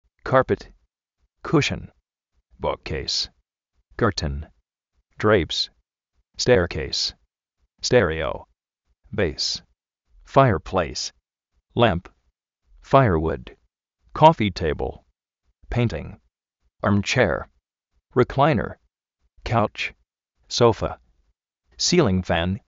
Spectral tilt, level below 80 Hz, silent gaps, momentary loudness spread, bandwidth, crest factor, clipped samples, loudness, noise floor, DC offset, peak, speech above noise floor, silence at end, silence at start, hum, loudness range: -4.5 dB/octave; -42 dBFS; none; 14 LU; 8 kHz; 24 dB; under 0.1%; -22 LUFS; -73 dBFS; under 0.1%; 0 dBFS; 52 dB; 0.1 s; 0.25 s; none; 4 LU